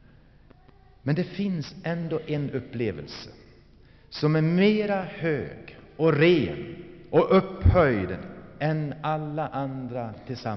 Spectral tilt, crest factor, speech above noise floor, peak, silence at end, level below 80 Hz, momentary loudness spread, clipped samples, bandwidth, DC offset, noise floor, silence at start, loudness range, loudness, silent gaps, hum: -6 dB/octave; 18 dB; 29 dB; -8 dBFS; 0 s; -44 dBFS; 18 LU; under 0.1%; 6.2 kHz; under 0.1%; -54 dBFS; 1.05 s; 7 LU; -26 LUFS; none; none